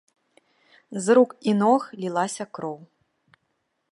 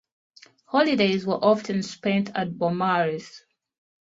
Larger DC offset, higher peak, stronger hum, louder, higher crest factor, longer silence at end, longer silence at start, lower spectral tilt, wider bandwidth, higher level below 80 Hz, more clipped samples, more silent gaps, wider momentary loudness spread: neither; about the same, -6 dBFS vs -6 dBFS; neither; about the same, -23 LUFS vs -24 LUFS; about the same, 20 dB vs 18 dB; first, 1.05 s vs 0.75 s; first, 0.9 s vs 0.7 s; about the same, -5.5 dB/octave vs -6 dB/octave; first, 11.5 kHz vs 7.8 kHz; second, -78 dBFS vs -66 dBFS; neither; neither; first, 16 LU vs 8 LU